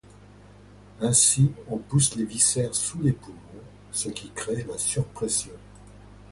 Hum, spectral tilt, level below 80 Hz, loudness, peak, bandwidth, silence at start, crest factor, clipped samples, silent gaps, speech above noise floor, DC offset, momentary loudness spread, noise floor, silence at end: 50 Hz at -45 dBFS; -4 dB/octave; -52 dBFS; -24 LUFS; -8 dBFS; 11.5 kHz; 1 s; 20 dB; under 0.1%; none; 24 dB; under 0.1%; 15 LU; -49 dBFS; 0.1 s